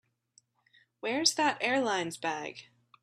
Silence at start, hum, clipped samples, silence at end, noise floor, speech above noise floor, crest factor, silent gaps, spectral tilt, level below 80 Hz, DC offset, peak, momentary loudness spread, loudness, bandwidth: 1.05 s; none; under 0.1%; 0.4 s; -68 dBFS; 38 dB; 22 dB; none; -2 dB/octave; -80 dBFS; under 0.1%; -10 dBFS; 14 LU; -30 LUFS; 13.5 kHz